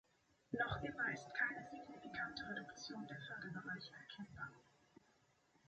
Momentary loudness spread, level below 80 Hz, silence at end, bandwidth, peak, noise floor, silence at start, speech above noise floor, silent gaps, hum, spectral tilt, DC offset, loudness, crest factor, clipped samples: 13 LU; -70 dBFS; 1.05 s; 8.2 kHz; -26 dBFS; -76 dBFS; 0.5 s; 29 dB; none; none; -4.5 dB/octave; under 0.1%; -46 LUFS; 22 dB; under 0.1%